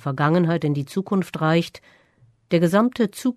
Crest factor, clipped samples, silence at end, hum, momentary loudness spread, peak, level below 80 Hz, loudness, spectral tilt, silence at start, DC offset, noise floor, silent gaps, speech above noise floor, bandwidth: 16 dB; under 0.1%; 0.05 s; none; 6 LU; -6 dBFS; -62 dBFS; -21 LUFS; -7 dB/octave; 0.05 s; under 0.1%; -58 dBFS; none; 37 dB; 13.5 kHz